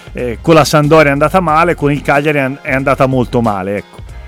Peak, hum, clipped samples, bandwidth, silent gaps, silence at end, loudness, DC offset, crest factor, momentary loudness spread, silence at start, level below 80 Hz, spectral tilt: 0 dBFS; none; under 0.1%; 16 kHz; none; 0 s; -11 LUFS; under 0.1%; 12 dB; 10 LU; 0.05 s; -32 dBFS; -6 dB/octave